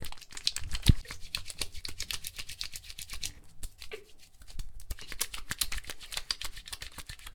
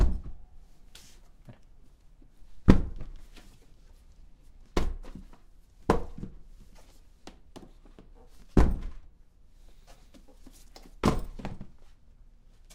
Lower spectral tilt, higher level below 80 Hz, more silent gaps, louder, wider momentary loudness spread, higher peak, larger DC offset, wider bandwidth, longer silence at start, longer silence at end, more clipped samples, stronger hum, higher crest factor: second, -3 dB/octave vs -7.5 dB/octave; about the same, -40 dBFS vs -36 dBFS; neither; second, -36 LUFS vs -30 LUFS; second, 17 LU vs 28 LU; second, -6 dBFS vs 0 dBFS; neither; first, 20 kHz vs 12 kHz; about the same, 0 s vs 0 s; second, 0 s vs 0.85 s; neither; neither; about the same, 30 dB vs 32 dB